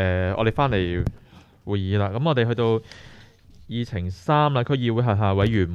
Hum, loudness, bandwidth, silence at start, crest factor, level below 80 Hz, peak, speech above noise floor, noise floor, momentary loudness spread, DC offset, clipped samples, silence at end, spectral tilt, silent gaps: none; -23 LUFS; 7 kHz; 0 s; 16 dB; -42 dBFS; -6 dBFS; 26 dB; -48 dBFS; 9 LU; under 0.1%; under 0.1%; 0 s; -8 dB/octave; none